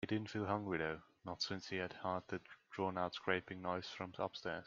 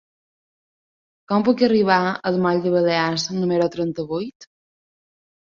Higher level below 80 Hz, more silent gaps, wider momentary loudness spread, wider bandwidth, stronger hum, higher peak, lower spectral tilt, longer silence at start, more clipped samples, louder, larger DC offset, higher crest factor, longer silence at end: second, -76 dBFS vs -62 dBFS; second, none vs 4.35-4.40 s; about the same, 9 LU vs 9 LU; about the same, 7.6 kHz vs 7.4 kHz; neither; second, -20 dBFS vs -2 dBFS; about the same, -5.5 dB/octave vs -5.5 dB/octave; second, 0 s vs 1.3 s; neither; second, -43 LUFS vs -20 LUFS; neither; about the same, 22 dB vs 20 dB; second, 0 s vs 1 s